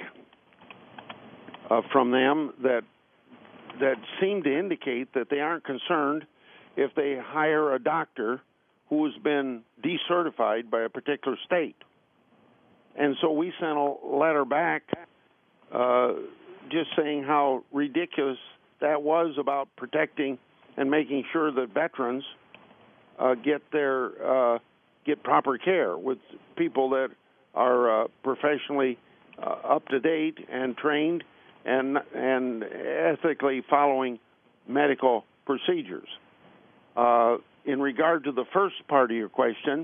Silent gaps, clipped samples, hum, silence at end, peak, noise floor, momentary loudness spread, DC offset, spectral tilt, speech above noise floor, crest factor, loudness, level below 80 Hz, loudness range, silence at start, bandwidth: none; under 0.1%; none; 0 s; -6 dBFS; -64 dBFS; 12 LU; under 0.1%; -3 dB/octave; 38 dB; 22 dB; -27 LUFS; -82 dBFS; 3 LU; 0 s; 3.7 kHz